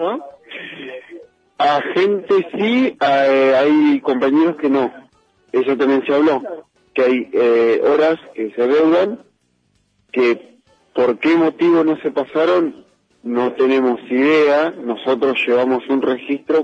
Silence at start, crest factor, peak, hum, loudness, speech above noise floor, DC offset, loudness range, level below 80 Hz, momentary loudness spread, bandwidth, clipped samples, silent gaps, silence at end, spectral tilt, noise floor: 0 s; 12 dB; -6 dBFS; none; -16 LUFS; 47 dB; under 0.1%; 3 LU; -66 dBFS; 12 LU; 8 kHz; under 0.1%; none; 0 s; -6.5 dB/octave; -62 dBFS